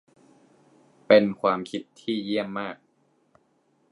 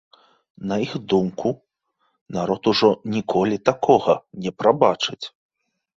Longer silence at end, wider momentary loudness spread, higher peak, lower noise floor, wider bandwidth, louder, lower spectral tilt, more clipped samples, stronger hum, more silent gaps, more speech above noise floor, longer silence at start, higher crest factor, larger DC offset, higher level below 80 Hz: first, 1.15 s vs 0.7 s; about the same, 16 LU vs 14 LU; about the same, -2 dBFS vs 0 dBFS; about the same, -67 dBFS vs -70 dBFS; first, 11 kHz vs 7.8 kHz; second, -25 LUFS vs -21 LUFS; about the same, -6.5 dB/octave vs -6 dB/octave; neither; neither; second, none vs 2.21-2.26 s; second, 43 dB vs 50 dB; first, 1.1 s vs 0.6 s; about the same, 24 dB vs 22 dB; neither; second, -72 dBFS vs -58 dBFS